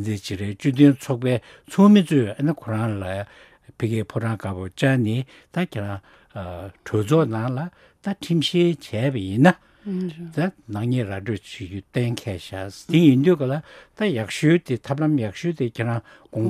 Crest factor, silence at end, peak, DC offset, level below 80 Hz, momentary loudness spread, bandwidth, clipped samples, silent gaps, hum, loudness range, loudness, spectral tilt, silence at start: 22 dB; 0 s; 0 dBFS; under 0.1%; -58 dBFS; 16 LU; 14.5 kHz; under 0.1%; none; none; 6 LU; -22 LUFS; -7 dB/octave; 0 s